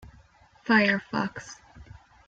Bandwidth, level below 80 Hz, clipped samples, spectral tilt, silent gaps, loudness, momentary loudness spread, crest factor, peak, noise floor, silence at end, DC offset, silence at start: 7.8 kHz; -58 dBFS; under 0.1%; -5 dB/octave; none; -25 LUFS; 23 LU; 22 dB; -8 dBFS; -57 dBFS; 0.45 s; under 0.1%; 0.05 s